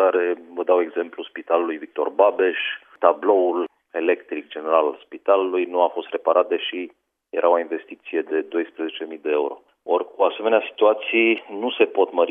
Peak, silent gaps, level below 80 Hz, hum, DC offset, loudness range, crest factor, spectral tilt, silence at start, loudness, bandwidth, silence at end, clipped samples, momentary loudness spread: 0 dBFS; none; -82 dBFS; none; under 0.1%; 3 LU; 20 dB; -6.5 dB/octave; 0 s; -22 LUFS; 3.8 kHz; 0 s; under 0.1%; 11 LU